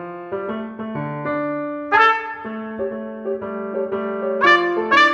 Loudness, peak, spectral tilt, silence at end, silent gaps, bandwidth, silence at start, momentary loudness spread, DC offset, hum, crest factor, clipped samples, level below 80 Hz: -20 LUFS; -2 dBFS; -5 dB/octave; 0 s; none; 9.2 kHz; 0 s; 14 LU; under 0.1%; none; 20 dB; under 0.1%; -62 dBFS